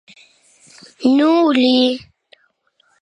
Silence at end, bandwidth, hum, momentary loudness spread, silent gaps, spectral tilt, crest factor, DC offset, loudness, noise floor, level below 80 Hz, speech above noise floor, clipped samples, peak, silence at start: 1.05 s; 9.8 kHz; none; 7 LU; none; -4 dB/octave; 16 dB; under 0.1%; -14 LUFS; -61 dBFS; -66 dBFS; 48 dB; under 0.1%; -2 dBFS; 1 s